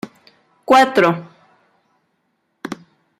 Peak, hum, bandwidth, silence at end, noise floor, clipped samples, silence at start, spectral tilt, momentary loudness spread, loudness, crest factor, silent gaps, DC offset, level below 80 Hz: -2 dBFS; none; 15.5 kHz; 0.45 s; -68 dBFS; under 0.1%; 0.05 s; -5 dB/octave; 24 LU; -14 LUFS; 18 dB; none; under 0.1%; -64 dBFS